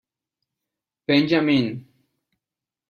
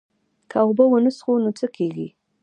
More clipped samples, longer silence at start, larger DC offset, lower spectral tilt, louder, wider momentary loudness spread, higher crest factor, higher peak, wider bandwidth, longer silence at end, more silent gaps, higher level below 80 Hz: neither; first, 1.1 s vs 0.55 s; neither; about the same, -7 dB/octave vs -7.5 dB/octave; about the same, -20 LUFS vs -20 LUFS; first, 16 LU vs 12 LU; about the same, 18 dB vs 18 dB; about the same, -6 dBFS vs -4 dBFS; second, 6.8 kHz vs 9.4 kHz; first, 1.1 s vs 0.35 s; neither; first, -64 dBFS vs -74 dBFS